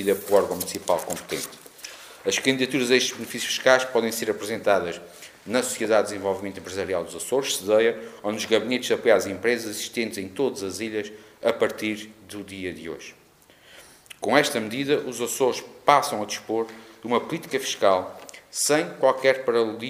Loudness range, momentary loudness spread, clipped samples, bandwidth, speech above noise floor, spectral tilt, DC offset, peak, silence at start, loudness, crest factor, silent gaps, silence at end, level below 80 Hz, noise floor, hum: 5 LU; 15 LU; under 0.1%; 15.5 kHz; 30 dB; -3 dB/octave; under 0.1%; 0 dBFS; 0 s; -24 LUFS; 24 dB; none; 0 s; -68 dBFS; -55 dBFS; none